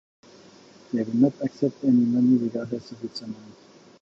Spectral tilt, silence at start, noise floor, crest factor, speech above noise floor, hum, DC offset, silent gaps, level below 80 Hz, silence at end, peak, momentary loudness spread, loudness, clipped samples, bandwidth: -8 dB/octave; 0.9 s; -51 dBFS; 16 dB; 27 dB; none; under 0.1%; none; -70 dBFS; 0.55 s; -8 dBFS; 16 LU; -24 LUFS; under 0.1%; 7.4 kHz